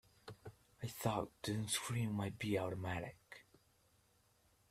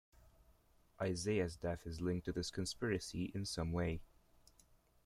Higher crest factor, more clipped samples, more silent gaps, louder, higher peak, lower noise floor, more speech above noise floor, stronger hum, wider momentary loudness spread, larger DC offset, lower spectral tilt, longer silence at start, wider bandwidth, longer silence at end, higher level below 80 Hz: about the same, 22 dB vs 18 dB; neither; neither; about the same, -42 LUFS vs -41 LUFS; about the same, -22 dBFS vs -24 dBFS; first, -74 dBFS vs -70 dBFS; about the same, 33 dB vs 30 dB; neither; first, 19 LU vs 5 LU; neither; about the same, -4.5 dB/octave vs -5.5 dB/octave; about the same, 0.25 s vs 0.25 s; about the same, 15.5 kHz vs 15 kHz; first, 1.3 s vs 1 s; second, -70 dBFS vs -60 dBFS